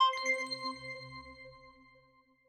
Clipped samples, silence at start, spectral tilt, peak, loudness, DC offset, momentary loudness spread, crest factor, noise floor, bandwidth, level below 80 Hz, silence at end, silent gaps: under 0.1%; 0 s; -1.5 dB/octave; -18 dBFS; -35 LUFS; under 0.1%; 21 LU; 20 dB; -67 dBFS; 12 kHz; -70 dBFS; 0.8 s; none